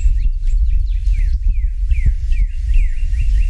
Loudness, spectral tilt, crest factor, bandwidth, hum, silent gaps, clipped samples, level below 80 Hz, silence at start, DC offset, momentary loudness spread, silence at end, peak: -20 LUFS; -6 dB/octave; 10 dB; 3.2 kHz; none; none; under 0.1%; -14 dBFS; 0 s; under 0.1%; 2 LU; 0 s; -4 dBFS